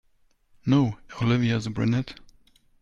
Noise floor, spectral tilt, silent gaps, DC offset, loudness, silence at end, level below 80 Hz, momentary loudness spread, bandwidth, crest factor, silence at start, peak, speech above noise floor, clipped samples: -63 dBFS; -7.5 dB/octave; none; under 0.1%; -25 LUFS; 0.65 s; -52 dBFS; 8 LU; 7.8 kHz; 18 dB; 0.65 s; -8 dBFS; 39 dB; under 0.1%